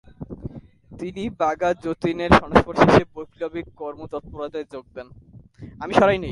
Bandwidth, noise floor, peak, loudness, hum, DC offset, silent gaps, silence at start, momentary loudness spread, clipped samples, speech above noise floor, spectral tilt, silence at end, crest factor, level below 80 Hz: 11.5 kHz; -43 dBFS; 0 dBFS; -21 LUFS; none; under 0.1%; none; 0.2 s; 21 LU; under 0.1%; 21 dB; -6.5 dB/octave; 0 s; 22 dB; -40 dBFS